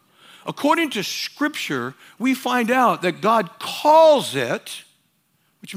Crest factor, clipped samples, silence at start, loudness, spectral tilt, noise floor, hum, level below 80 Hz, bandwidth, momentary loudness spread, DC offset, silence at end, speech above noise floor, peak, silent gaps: 16 dB; under 0.1%; 0.45 s; -19 LUFS; -4 dB/octave; -65 dBFS; none; -78 dBFS; 16 kHz; 16 LU; under 0.1%; 0 s; 46 dB; -4 dBFS; none